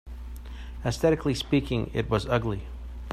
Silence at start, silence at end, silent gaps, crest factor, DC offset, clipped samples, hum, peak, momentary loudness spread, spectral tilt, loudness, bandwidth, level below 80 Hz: 0.05 s; 0 s; none; 18 dB; under 0.1%; under 0.1%; none; -10 dBFS; 17 LU; -6.5 dB/octave; -27 LUFS; 15 kHz; -38 dBFS